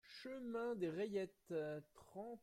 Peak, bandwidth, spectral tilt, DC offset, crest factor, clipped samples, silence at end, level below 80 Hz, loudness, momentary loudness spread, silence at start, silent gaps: -32 dBFS; 15.5 kHz; -6.5 dB/octave; under 0.1%; 14 dB; under 0.1%; 0.05 s; -82 dBFS; -46 LUFS; 10 LU; 0.05 s; none